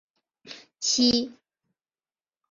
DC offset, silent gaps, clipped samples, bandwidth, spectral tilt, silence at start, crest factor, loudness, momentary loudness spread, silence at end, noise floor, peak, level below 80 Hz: under 0.1%; none; under 0.1%; 7.6 kHz; -2 dB/octave; 0.45 s; 20 dB; -23 LUFS; 24 LU; 1.2 s; under -90 dBFS; -10 dBFS; -62 dBFS